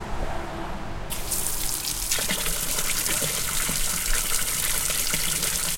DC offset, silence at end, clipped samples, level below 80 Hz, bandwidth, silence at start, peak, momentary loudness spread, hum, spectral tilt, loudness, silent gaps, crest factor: under 0.1%; 0 s; under 0.1%; -34 dBFS; 17 kHz; 0 s; -8 dBFS; 10 LU; none; -1 dB/octave; -24 LUFS; none; 18 dB